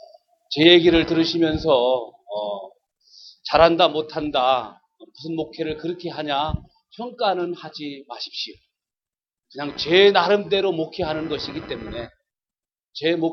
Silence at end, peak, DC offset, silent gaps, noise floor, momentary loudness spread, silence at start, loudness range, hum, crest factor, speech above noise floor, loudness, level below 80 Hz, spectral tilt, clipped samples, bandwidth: 0 s; -2 dBFS; under 0.1%; none; under -90 dBFS; 19 LU; 0.5 s; 8 LU; none; 20 dB; over 70 dB; -20 LUFS; -46 dBFS; -6 dB/octave; under 0.1%; 6.6 kHz